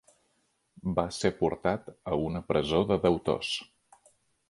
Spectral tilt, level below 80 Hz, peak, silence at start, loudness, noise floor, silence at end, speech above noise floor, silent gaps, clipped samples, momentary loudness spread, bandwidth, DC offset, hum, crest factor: -5.5 dB/octave; -52 dBFS; -10 dBFS; 0.85 s; -29 LUFS; -74 dBFS; 0.85 s; 45 dB; none; under 0.1%; 7 LU; 11.5 kHz; under 0.1%; none; 20 dB